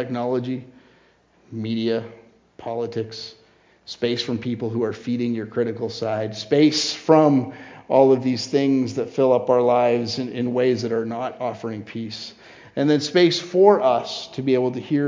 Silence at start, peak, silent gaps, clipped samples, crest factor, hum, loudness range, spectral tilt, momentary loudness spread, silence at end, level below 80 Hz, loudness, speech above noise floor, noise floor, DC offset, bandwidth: 0 s; 0 dBFS; none; under 0.1%; 20 dB; none; 9 LU; -5.5 dB/octave; 16 LU; 0 s; -64 dBFS; -21 LUFS; 37 dB; -57 dBFS; under 0.1%; 7.6 kHz